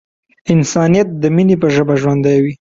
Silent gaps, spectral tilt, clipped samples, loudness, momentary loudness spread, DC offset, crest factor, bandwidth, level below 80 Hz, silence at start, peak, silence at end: none; -7 dB/octave; under 0.1%; -13 LUFS; 3 LU; under 0.1%; 12 dB; 7.8 kHz; -48 dBFS; 0.45 s; 0 dBFS; 0.25 s